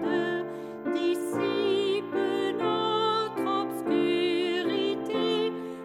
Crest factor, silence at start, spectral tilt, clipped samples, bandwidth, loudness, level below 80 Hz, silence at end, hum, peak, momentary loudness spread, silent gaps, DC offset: 12 dB; 0 s; -5 dB/octave; under 0.1%; 15 kHz; -28 LUFS; -74 dBFS; 0 s; none; -16 dBFS; 5 LU; none; under 0.1%